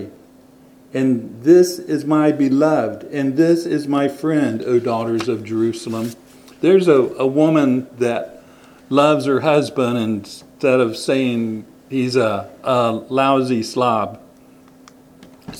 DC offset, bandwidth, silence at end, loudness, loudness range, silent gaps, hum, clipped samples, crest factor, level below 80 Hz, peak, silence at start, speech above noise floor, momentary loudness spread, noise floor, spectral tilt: under 0.1%; 16 kHz; 0 s; -18 LUFS; 3 LU; none; none; under 0.1%; 18 dB; -64 dBFS; 0 dBFS; 0 s; 30 dB; 10 LU; -47 dBFS; -6.5 dB/octave